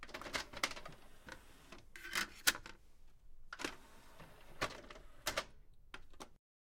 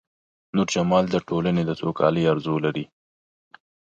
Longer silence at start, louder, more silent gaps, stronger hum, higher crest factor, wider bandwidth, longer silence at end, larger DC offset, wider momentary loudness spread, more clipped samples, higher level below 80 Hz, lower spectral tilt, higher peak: second, 0 s vs 0.55 s; second, -41 LUFS vs -23 LUFS; neither; neither; first, 32 dB vs 18 dB; first, 16.5 kHz vs 7.8 kHz; second, 0.4 s vs 1.15 s; neither; first, 24 LU vs 7 LU; neither; second, -60 dBFS vs -54 dBFS; second, -1 dB/octave vs -6 dB/octave; second, -14 dBFS vs -6 dBFS